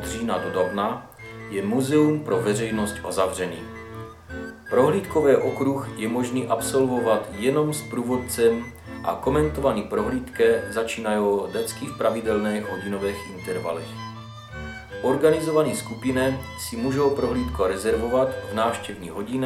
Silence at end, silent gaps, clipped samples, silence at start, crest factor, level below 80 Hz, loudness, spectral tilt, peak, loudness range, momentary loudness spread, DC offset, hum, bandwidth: 0 s; none; under 0.1%; 0 s; 18 dB; -46 dBFS; -24 LUFS; -5.5 dB/octave; -4 dBFS; 3 LU; 15 LU; under 0.1%; none; 15.5 kHz